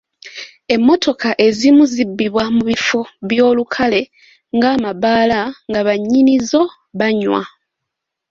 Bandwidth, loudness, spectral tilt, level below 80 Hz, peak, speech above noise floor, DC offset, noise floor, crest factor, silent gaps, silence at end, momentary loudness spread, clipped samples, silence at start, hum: 7.8 kHz; -15 LUFS; -4.5 dB/octave; -52 dBFS; 0 dBFS; 65 dB; under 0.1%; -79 dBFS; 14 dB; none; 0.85 s; 9 LU; under 0.1%; 0.25 s; none